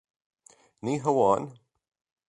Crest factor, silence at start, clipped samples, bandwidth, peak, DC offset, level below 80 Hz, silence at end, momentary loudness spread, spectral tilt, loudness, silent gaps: 20 dB; 0.85 s; under 0.1%; 11 kHz; -10 dBFS; under 0.1%; -66 dBFS; 0.75 s; 15 LU; -7 dB/octave; -26 LUFS; none